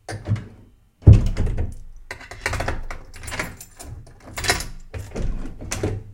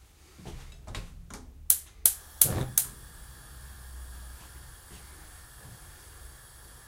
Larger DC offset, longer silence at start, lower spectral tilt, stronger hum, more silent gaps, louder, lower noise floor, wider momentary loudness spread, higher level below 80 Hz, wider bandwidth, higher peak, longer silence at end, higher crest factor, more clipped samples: neither; about the same, 0.1 s vs 0 s; first, -5.5 dB/octave vs -2 dB/octave; neither; neither; about the same, -23 LUFS vs -25 LUFS; about the same, -50 dBFS vs -51 dBFS; second, 22 LU vs 25 LU; first, -28 dBFS vs -48 dBFS; about the same, 16.5 kHz vs 16 kHz; about the same, 0 dBFS vs 0 dBFS; about the same, 0 s vs 0 s; second, 22 dB vs 34 dB; neither